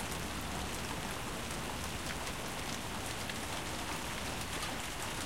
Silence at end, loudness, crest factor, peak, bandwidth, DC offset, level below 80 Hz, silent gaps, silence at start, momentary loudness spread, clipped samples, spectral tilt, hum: 0 s; -39 LUFS; 18 dB; -22 dBFS; 16.5 kHz; 0.3%; -50 dBFS; none; 0 s; 1 LU; under 0.1%; -3 dB/octave; none